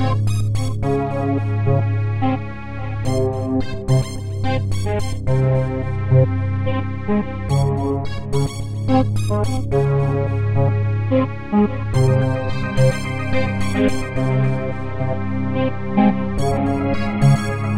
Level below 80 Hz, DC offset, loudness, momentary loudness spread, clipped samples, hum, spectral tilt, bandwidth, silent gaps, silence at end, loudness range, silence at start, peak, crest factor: -34 dBFS; 2%; -20 LUFS; 6 LU; under 0.1%; none; -7.5 dB/octave; 12 kHz; none; 0 s; 2 LU; 0 s; -4 dBFS; 16 dB